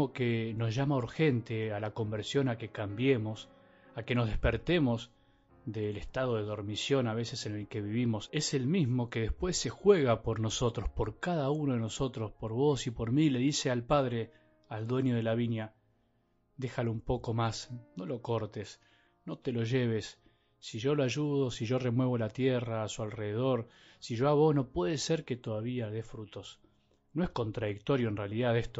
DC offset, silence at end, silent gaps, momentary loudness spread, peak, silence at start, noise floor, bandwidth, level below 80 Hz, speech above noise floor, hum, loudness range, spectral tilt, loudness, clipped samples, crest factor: under 0.1%; 0 s; none; 12 LU; -12 dBFS; 0 s; -73 dBFS; 8 kHz; -50 dBFS; 41 dB; none; 5 LU; -6 dB/octave; -32 LUFS; under 0.1%; 20 dB